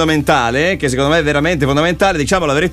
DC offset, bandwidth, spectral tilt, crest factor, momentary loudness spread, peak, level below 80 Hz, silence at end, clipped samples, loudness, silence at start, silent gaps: under 0.1%; 15.5 kHz; -5 dB/octave; 12 dB; 2 LU; -2 dBFS; -32 dBFS; 0 s; under 0.1%; -14 LUFS; 0 s; none